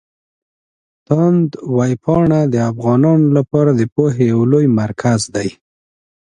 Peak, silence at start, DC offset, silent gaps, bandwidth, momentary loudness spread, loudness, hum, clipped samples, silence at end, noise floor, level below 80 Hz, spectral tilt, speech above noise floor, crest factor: 0 dBFS; 1.1 s; under 0.1%; 3.92-3.96 s; 11 kHz; 5 LU; -14 LUFS; none; under 0.1%; 0.9 s; under -90 dBFS; -48 dBFS; -7.5 dB/octave; over 77 dB; 14 dB